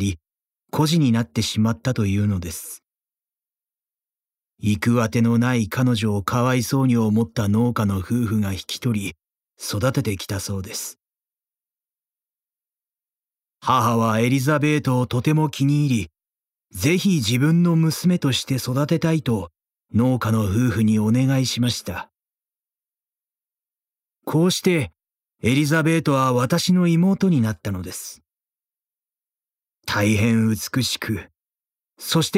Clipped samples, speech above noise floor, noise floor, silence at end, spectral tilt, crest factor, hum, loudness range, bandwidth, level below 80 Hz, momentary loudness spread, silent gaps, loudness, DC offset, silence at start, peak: under 0.1%; over 70 dB; under -90 dBFS; 0 s; -5.5 dB/octave; 16 dB; none; 7 LU; 16 kHz; -52 dBFS; 11 LU; none; -21 LUFS; under 0.1%; 0 s; -4 dBFS